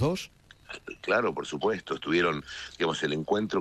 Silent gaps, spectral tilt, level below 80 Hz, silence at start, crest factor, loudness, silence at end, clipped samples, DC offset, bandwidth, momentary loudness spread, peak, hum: none; -5 dB/octave; -58 dBFS; 0 s; 18 dB; -29 LUFS; 0 s; under 0.1%; under 0.1%; 13 kHz; 15 LU; -10 dBFS; none